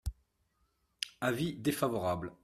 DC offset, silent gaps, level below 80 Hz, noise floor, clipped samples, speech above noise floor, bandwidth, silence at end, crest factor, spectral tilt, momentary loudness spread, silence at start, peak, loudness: under 0.1%; none; -52 dBFS; -76 dBFS; under 0.1%; 43 dB; 15.5 kHz; 0.1 s; 22 dB; -5 dB/octave; 9 LU; 0.05 s; -14 dBFS; -35 LUFS